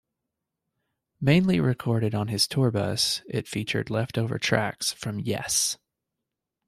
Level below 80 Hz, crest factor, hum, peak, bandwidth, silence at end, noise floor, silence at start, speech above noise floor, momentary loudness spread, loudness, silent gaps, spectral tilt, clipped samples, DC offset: -58 dBFS; 20 dB; none; -6 dBFS; 14.5 kHz; 0.9 s; -85 dBFS; 1.2 s; 60 dB; 8 LU; -25 LUFS; none; -4.5 dB/octave; under 0.1%; under 0.1%